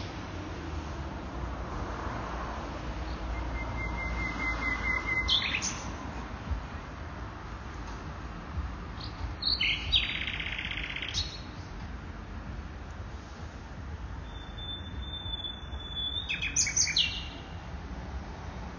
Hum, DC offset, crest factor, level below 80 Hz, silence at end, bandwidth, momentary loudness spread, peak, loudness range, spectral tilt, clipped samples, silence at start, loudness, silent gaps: none; under 0.1%; 22 dB; -40 dBFS; 0 s; 7.4 kHz; 16 LU; -12 dBFS; 10 LU; -2 dB/octave; under 0.1%; 0 s; -33 LUFS; none